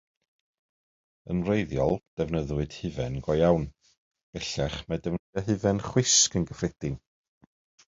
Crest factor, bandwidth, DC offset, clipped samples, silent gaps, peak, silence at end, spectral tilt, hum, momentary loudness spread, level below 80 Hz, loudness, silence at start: 20 dB; 8 kHz; under 0.1%; under 0.1%; 2.07-2.17 s, 3.97-4.11 s, 4.23-4.33 s, 5.19-5.33 s; -8 dBFS; 0.95 s; -4 dB/octave; none; 13 LU; -46 dBFS; -27 LUFS; 1.25 s